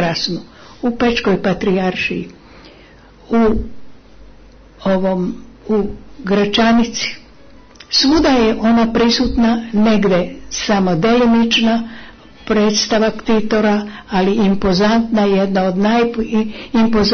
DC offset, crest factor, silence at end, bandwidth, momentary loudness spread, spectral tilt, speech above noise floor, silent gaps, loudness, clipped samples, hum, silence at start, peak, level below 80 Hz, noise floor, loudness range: under 0.1%; 12 dB; 0 s; 6.6 kHz; 11 LU; -5 dB/octave; 28 dB; none; -15 LUFS; under 0.1%; none; 0 s; -4 dBFS; -36 dBFS; -43 dBFS; 6 LU